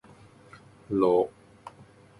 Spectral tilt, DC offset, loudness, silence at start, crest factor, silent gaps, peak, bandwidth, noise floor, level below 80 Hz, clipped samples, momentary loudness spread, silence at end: -8.5 dB/octave; under 0.1%; -26 LUFS; 0.9 s; 20 dB; none; -10 dBFS; 11.5 kHz; -54 dBFS; -64 dBFS; under 0.1%; 25 LU; 0.5 s